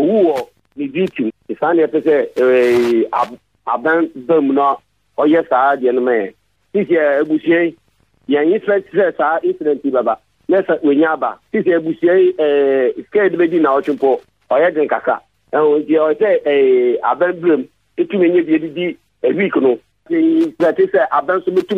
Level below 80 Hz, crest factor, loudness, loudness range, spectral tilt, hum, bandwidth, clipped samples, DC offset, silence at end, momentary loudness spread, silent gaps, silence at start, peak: -62 dBFS; 12 dB; -15 LUFS; 2 LU; -7.5 dB/octave; none; 7.6 kHz; under 0.1%; under 0.1%; 0 s; 9 LU; none; 0 s; -4 dBFS